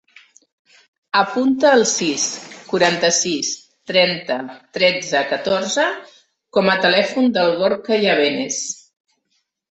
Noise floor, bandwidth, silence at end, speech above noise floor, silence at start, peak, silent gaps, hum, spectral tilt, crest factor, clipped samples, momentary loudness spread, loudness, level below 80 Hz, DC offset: -69 dBFS; 8.4 kHz; 0.95 s; 52 dB; 1.15 s; -2 dBFS; none; none; -2.5 dB/octave; 18 dB; under 0.1%; 10 LU; -17 LUFS; -64 dBFS; under 0.1%